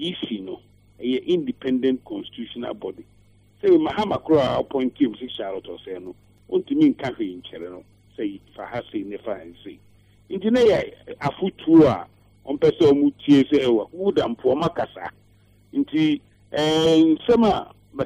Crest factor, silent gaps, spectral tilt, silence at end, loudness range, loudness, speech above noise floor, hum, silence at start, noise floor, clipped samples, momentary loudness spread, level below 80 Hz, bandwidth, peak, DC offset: 18 dB; none; -6.5 dB/octave; 0 s; 8 LU; -21 LUFS; 35 dB; 50 Hz at -55 dBFS; 0 s; -56 dBFS; under 0.1%; 18 LU; -54 dBFS; 9.8 kHz; -4 dBFS; under 0.1%